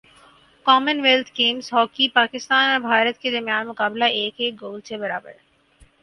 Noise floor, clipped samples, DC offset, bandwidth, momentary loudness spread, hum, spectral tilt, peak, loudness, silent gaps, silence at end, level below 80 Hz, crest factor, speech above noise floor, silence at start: -55 dBFS; under 0.1%; under 0.1%; 11.5 kHz; 11 LU; none; -2.5 dB/octave; 0 dBFS; -19 LUFS; none; 0.7 s; -66 dBFS; 20 dB; 34 dB; 0.65 s